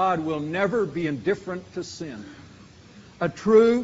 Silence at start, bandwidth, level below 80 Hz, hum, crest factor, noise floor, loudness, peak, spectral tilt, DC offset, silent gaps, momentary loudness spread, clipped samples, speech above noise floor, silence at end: 0 s; 7.8 kHz; -58 dBFS; none; 18 dB; -48 dBFS; -24 LUFS; -6 dBFS; -5.5 dB/octave; under 0.1%; none; 18 LU; under 0.1%; 25 dB; 0 s